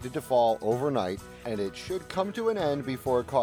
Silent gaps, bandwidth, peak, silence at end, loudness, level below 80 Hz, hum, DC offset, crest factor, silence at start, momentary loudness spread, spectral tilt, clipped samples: none; 19.5 kHz; -12 dBFS; 0 s; -29 LUFS; -56 dBFS; none; under 0.1%; 16 dB; 0 s; 9 LU; -6 dB/octave; under 0.1%